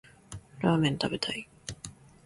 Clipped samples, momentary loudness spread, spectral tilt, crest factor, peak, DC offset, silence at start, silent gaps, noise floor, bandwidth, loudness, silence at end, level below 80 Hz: under 0.1%; 21 LU; -5.5 dB/octave; 20 dB; -12 dBFS; under 0.1%; 0.3 s; none; -49 dBFS; 11.5 kHz; -29 LUFS; 0.35 s; -58 dBFS